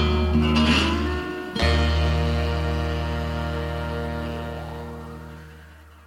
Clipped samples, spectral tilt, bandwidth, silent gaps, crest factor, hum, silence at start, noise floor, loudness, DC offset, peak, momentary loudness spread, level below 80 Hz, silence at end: under 0.1%; -6 dB/octave; 11.5 kHz; none; 16 dB; none; 0 s; -46 dBFS; -24 LUFS; under 0.1%; -8 dBFS; 17 LU; -28 dBFS; 0.1 s